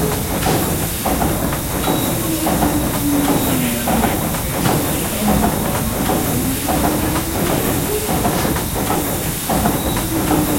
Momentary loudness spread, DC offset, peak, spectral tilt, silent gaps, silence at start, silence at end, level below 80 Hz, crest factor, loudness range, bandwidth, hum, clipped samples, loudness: 3 LU; under 0.1%; -2 dBFS; -4.5 dB/octave; none; 0 s; 0 s; -30 dBFS; 16 dB; 1 LU; 16.5 kHz; none; under 0.1%; -17 LUFS